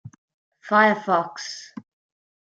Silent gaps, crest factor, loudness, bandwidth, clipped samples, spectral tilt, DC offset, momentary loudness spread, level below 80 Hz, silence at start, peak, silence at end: 0.18-0.28 s, 0.34-0.52 s; 20 dB; -20 LUFS; 9 kHz; under 0.1%; -4.5 dB/octave; under 0.1%; 19 LU; -76 dBFS; 0.05 s; -4 dBFS; 0.6 s